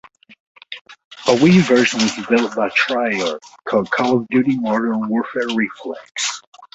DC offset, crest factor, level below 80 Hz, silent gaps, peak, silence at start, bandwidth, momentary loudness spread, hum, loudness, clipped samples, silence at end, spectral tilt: under 0.1%; 16 dB; -56 dBFS; 0.81-0.85 s, 1.05-1.11 s, 6.47-6.52 s; -2 dBFS; 0.7 s; 8.2 kHz; 18 LU; none; -17 LUFS; under 0.1%; 0.1 s; -5 dB/octave